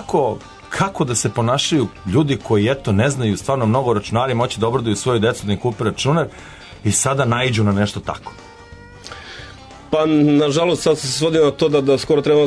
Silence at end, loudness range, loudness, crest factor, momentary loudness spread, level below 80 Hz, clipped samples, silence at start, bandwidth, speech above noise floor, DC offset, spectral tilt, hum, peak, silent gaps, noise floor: 0 s; 3 LU; -18 LUFS; 14 dB; 16 LU; -46 dBFS; under 0.1%; 0 s; 11 kHz; 23 dB; under 0.1%; -5 dB/octave; none; -4 dBFS; none; -40 dBFS